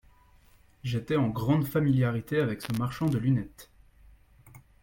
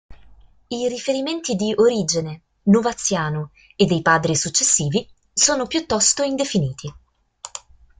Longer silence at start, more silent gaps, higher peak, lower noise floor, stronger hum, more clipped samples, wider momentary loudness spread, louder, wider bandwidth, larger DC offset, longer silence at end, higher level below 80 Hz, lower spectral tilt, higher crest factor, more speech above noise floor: first, 0.85 s vs 0.1 s; neither; second, -12 dBFS vs -2 dBFS; first, -59 dBFS vs -48 dBFS; neither; neither; second, 8 LU vs 18 LU; second, -28 LUFS vs -19 LUFS; first, 17 kHz vs 9.8 kHz; neither; second, 0.25 s vs 0.4 s; about the same, -56 dBFS vs -52 dBFS; first, -8 dB/octave vs -3.5 dB/octave; about the same, 18 dB vs 20 dB; about the same, 32 dB vs 29 dB